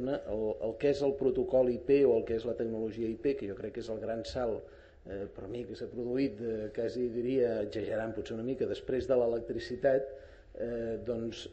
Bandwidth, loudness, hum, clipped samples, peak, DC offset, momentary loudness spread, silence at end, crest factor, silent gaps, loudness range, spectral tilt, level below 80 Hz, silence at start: 8.4 kHz; -33 LUFS; none; under 0.1%; -16 dBFS; under 0.1%; 12 LU; 0 s; 16 dB; none; 7 LU; -7 dB/octave; -56 dBFS; 0 s